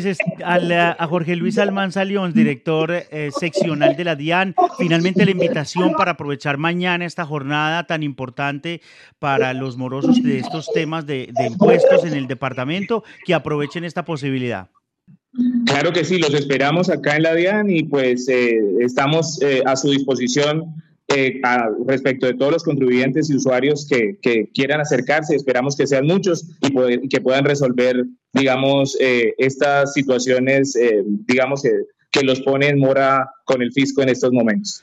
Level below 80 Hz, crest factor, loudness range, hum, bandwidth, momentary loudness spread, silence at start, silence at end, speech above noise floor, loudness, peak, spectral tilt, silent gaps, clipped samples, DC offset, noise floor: -66 dBFS; 16 dB; 4 LU; none; 10 kHz; 7 LU; 0 s; 0.05 s; 35 dB; -18 LUFS; 0 dBFS; -5.5 dB/octave; none; under 0.1%; under 0.1%; -53 dBFS